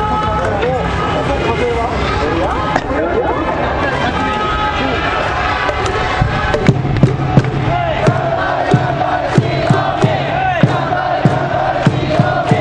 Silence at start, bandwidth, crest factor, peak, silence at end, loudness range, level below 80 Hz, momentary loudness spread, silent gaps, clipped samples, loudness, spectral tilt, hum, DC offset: 0 s; 9.8 kHz; 14 dB; 0 dBFS; 0 s; 2 LU; -28 dBFS; 3 LU; none; under 0.1%; -15 LUFS; -6.5 dB/octave; none; under 0.1%